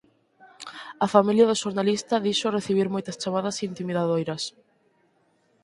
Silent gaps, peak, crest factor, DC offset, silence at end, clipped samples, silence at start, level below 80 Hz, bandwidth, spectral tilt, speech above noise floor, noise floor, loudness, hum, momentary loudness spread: none; -2 dBFS; 24 dB; under 0.1%; 1.15 s; under 0.1%; 0.45 s; -68 dBFS; 11.5 kHz; -5 dB/octave; 42 dB; -66 dBFS; -24 LUFS; none; 14 LU